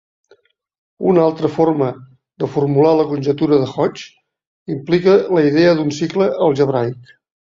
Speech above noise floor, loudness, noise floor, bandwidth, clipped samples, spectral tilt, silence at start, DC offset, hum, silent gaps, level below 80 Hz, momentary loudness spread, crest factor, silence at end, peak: 40 dB; -16 LUFS; -55 dBFS; 7.6 kHz; under 0.1%; -7.5 dB/octave; 1 s; under 0.1%; none; 4.47-4.66 s; -56 dBFS; 13 LU; 14 dB; 0.55 s; -2 dBFS